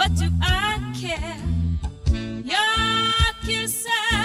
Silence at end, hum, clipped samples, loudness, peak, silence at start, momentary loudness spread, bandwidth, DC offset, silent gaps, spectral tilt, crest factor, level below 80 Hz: 0 s; none; under 0.1%; -22 LUFS; -6 dBFS; 0 s; 8 LU; 16 kHz; under 0.1%; none; -3.5 dB/octave; 16 dB; -30 dBFS